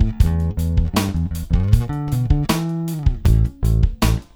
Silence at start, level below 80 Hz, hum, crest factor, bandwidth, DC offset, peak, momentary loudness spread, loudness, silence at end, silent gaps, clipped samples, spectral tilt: 0 s; -20 dBFS; none; 16 dB; 18 kHz; under 0.1%; 0 dBFS; 4 LU; -20 LUFS; 0.1 s; none; under 0.1%; -6.5 dB/octave